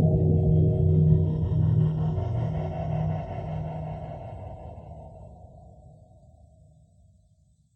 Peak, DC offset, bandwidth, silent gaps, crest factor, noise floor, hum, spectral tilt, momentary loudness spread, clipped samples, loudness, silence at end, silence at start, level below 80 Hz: -10 dBFS; under 0.1%; 3.4 kHz; none; 18 dB; -62 dBFS; none; -11.5 dB/octave; 22 LU; under 0.1%; -25 LUFS; 2.15 s; 0 s; -40 dBFS